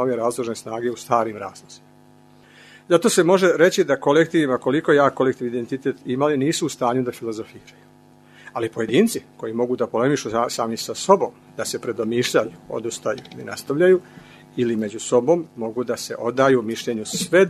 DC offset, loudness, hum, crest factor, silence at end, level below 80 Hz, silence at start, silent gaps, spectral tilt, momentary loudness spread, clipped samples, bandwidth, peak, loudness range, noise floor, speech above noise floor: under 0.1%; -21 LUFS; none; 20 dB; 0 s; -64 dBFS; 0 s; none; -4.5 dB/octave; 12 LU; under 0.1%; 13.5 kHz; 0 dBFS; 6 LU; -51 dBFS; 30 dB